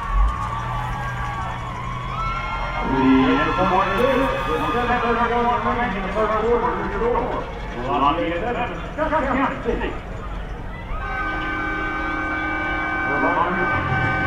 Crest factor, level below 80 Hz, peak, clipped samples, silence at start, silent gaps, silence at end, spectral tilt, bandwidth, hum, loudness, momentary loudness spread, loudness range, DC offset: 16 dB; -30 dBFS; -4 dBFS; under 0.1%; 0 s; none; 0 s; -6.5 dB/octave; 13.5 kHz; none; -22 LUFS; 10 LU; 6 LU; under 0.1%